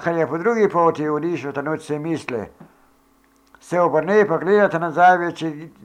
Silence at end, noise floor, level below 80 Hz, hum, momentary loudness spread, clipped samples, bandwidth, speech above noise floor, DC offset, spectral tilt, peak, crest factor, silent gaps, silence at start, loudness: 0.15 s; -57 dBFS; -64 dBFS; none; 12 LU; under 0.1%; 11 kHz; 38 dB; under 0.1%; -6.5 dB/octave; -4 dBFS; 16 dB; none; 0 s; -19 LUFS